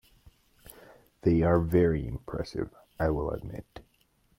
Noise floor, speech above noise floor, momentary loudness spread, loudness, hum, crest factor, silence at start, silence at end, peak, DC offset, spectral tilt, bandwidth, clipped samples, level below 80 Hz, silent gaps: -68 dBFS; 41 dB; 15 LU; -29 LUFS; none; 18 dB; 1.25 s; 0.6 s; -12 dBFS; under 0.1%; -9 dB/octave; 16 kHz; under 0.1%; -46 dBFS; none